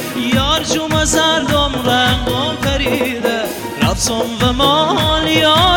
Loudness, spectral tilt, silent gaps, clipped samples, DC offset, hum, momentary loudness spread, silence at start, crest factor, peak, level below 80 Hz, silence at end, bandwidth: -14 LUFS; -3.5 dB/octave; none; under 0.1%; under 0.1%; none; 5 LU; 0 s; 12 dB; -2 dBFS; -28 dBFS; 0 s; 19 kHz